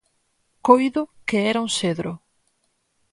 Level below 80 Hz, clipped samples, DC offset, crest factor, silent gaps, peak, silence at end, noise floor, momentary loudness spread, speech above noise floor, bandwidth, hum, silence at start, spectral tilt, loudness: -62 dBFS; under 0.1%; under 0.1%; 22 dB; none; 0 dBFS; 0.95 s; -70 dBFS; 13 LU; 49 dB; 11.5 kHz; none; 0.65 s; -4.5 dB/octave; -21 LUFS